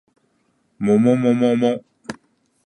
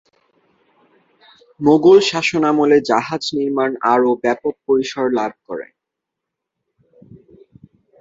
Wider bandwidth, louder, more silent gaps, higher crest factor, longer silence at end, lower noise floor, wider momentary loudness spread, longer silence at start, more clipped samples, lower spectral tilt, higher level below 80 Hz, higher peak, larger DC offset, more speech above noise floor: first, 9.4 kHz vs 7.8 kHz; about the same, -18 LUFS vs -16 LUFS; neither; about the same, 16 dB vs 18 dB; second, 0.5 s vs 2.35 s; second, -65 dBFS vs -81 dBFS; first, 20 LU vs 11 LU; second, 0.8 s vs 1.6 s; neither; first, -7.5 dB/octave vs -5 dB/octave; about the same, -62 dBFS vs -60 dBFS; about the same, -4 dBFS vs -2 dBFS; neither; second, 49 dB vs 66 dB